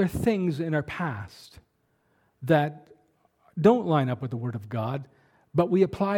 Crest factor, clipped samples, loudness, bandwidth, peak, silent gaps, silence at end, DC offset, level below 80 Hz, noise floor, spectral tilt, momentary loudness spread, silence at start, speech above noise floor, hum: 20 dB; under 0.1%; -26 LUFS; 18 kHz; -6 dBFS; none; 0 s; under 0.1%; -54 dBFS; -70 dBFS; -8 dB/octave; 14 LU; 0 s; 45 dB; none